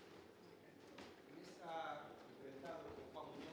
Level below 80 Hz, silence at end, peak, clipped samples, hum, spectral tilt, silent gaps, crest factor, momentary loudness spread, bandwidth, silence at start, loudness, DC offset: -82 dBFS; 0 s; -38 dBFS; under 0.1%; none; -5 dB/octave; none; 18 dB; 13 LU; over 20 kHz; 0 s; -55 LUFS; under 0.1%